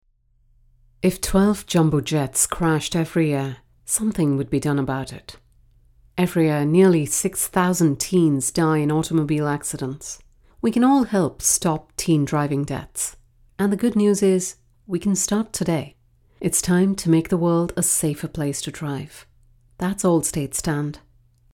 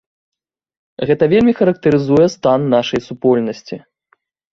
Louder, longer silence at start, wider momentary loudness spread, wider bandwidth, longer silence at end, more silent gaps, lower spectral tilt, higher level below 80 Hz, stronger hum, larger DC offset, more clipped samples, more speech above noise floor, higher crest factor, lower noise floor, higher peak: second, -21 LUFS vs -14 LUFS; about the same, 1.05 s vs 1 s; about the same, 11 LU vs 12 LU; first, 18 kHz vs 7.4 kHz; second, 0.55 s vs 0.75 s; neither; second, -5 dB/octave vs -7 dB/octave; about the same, -46 dBFS vs -50 dBFS; neither; neither; neither; second, 40 dB vs 47 dB; about the same, 18 dB vs 14 dB; about the same, -60 dBFS vs -61 dBFS; about the same, -4 dBFS vs -2 dBFS